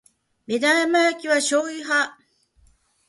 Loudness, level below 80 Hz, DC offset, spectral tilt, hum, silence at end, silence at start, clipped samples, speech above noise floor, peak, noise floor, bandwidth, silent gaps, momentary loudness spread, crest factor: -21 LUFS; -68 dBFS; under 0.1%; -1.5 dB/octave; none; 1 s; 0.5 s; under 0.1%; 39 dB; -6 dBFS; -60 dBFS; 11.5 kHz; none; 7 LU; 16 dB